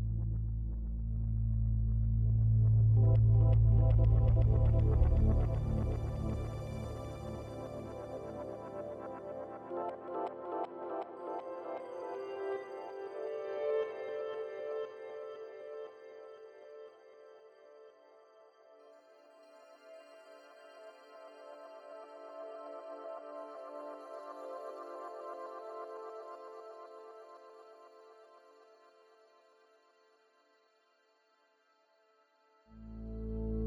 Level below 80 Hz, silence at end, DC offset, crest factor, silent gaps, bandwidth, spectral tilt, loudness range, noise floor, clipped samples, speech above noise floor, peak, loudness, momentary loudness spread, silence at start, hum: -40 dBFS; 0 s; under 0.1%; 18 dB; none; 5 kHz; -10 dB/octave; 25 LU; -72 dBFS; under 0.1%; 45 dB; -16 dBFS; -35 LUFS; 25 LU; 0 s; none